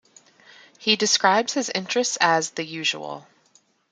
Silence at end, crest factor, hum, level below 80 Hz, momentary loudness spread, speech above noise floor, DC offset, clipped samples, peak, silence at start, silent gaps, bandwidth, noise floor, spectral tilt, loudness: 0.7 s; 22 dB; none; -74 dBFS; 12 LU; 39 dB; under 0.1%; under 0.1%; -2 dBFS; 0.8 s; none; 11 kHz; -61 dBFS; -1.5 dB/octave; -21 LUFS